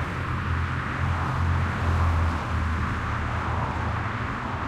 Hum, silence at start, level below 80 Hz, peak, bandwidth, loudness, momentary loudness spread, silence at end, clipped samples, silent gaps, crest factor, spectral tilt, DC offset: none; 0 s; -36 dBFS; -14 dBFS; 9.4 kHz; -27 LUFS; 4 LU; 0 s; under 0.1%; none; 12 dB; -7 dB/octave; under 0.1%